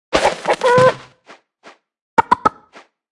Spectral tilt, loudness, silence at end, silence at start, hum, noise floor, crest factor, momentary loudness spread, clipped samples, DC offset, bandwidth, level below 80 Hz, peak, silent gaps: -4.5 dB/octave; -16 LUFS; 0.6 s; 0.1 s; none; -48 dBFS; 18 dB; 7 LU; under 0.1%; under 0.1%; 12 kHz; -48 dBFS; 0 dBFS; 2.01-2.17 s